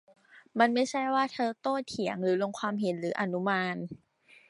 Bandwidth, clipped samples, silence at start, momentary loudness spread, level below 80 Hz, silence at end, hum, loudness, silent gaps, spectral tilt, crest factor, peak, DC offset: 11.5 kHz; under 0.1%; 0.35 s; 9 LU; -76 dBFS; 0.55 s; none; -30 LUFS; none; -5.5 dB/octave; 22 dB; -10 dBFS; under 0.1%